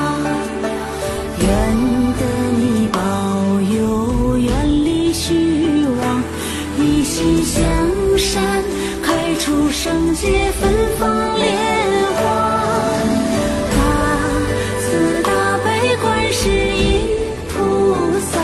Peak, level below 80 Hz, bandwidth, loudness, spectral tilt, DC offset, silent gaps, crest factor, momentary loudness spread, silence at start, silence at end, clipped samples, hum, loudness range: -2 dBFS; -28 dBFS; 12.5 kHz; -17 LUFS; -5 dB/octave; under 0.1%; none; 14 dB; 4 LU; 0 s; 0 s; under 0.1%; none; 1 LU